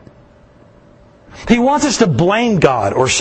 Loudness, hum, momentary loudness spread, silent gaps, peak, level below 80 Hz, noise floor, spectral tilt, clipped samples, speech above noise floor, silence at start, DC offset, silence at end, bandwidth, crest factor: -13 LUFS; none; 3 LU; none; 0 dBFS; -40 dBFS; -45 dBFS; -4.5 dB/octave; under 0.1%; 32 dB; 1.35 s; under 0.1%; 0 s; 8.8 kHz; 16 dB